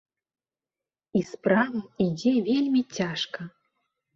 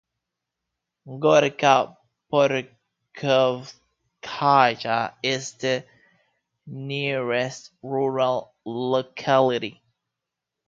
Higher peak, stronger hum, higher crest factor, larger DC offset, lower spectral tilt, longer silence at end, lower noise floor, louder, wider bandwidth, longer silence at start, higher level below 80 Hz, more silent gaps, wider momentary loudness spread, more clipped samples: second, -8 dBFS vs -2 dBFS; neither; about the same, 20 dB vs 22 dB; neither; first, -6 dB/octave vs -4.5 dB/octave; second, 0.65 s vs 0.95 s; first, under -90 dBFS vs -85 dBFS; second, -26 LUFS vs -23 LUFS; about the same, 7.4 kHz vs 7.8 kHz; about the same, 1.15 s vs 1.05 s; about the same, -66 dBFS vs -70 dBFS; neither; second, 9 LU vs 16 LU; neither